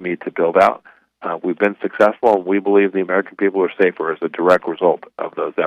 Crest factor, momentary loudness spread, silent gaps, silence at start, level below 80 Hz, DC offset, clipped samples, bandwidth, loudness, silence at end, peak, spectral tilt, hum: 16 dB; 10 LU; none; 0 s; -62 dBFS; under 0.1%; under 0.1%; 9.4 kHz; -17 LUFS; 0 s; -2 dBFS; -7 dB/octave; none